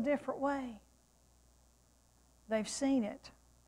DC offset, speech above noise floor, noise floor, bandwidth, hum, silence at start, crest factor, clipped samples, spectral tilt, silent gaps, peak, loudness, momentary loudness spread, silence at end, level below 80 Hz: under 0.1%; 33 dB; -68 dBFS; 12.5 kHz; none; 0 s; 16 dB; under 0.1%; -4.5 dB/octave; none; -24 dBFS; -36 LUFS; 19 LU; 0.35 s; -68 dBFS